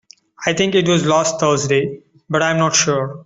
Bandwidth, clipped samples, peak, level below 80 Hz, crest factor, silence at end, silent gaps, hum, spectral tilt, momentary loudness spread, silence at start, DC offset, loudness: 8.2 kHz; under 0.1%; -2 dBFS; -54 dBFS; 16 dB; 0.05 s; none; none; -4 dB/octave; 7 LU; 0.4 s; under 0.1%; -16 LUFS